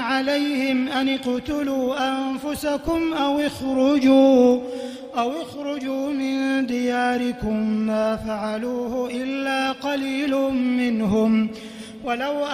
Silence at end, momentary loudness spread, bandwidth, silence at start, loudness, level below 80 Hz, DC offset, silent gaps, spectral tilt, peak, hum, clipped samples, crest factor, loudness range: 0 s; 9 LU; 15 kHz; 0 s; -22 LUFS; -50 dBFS; under 0.1%; none; -5 dB/octave; -4 dBFS; none; under 0.1%; 16 dB; 4 LU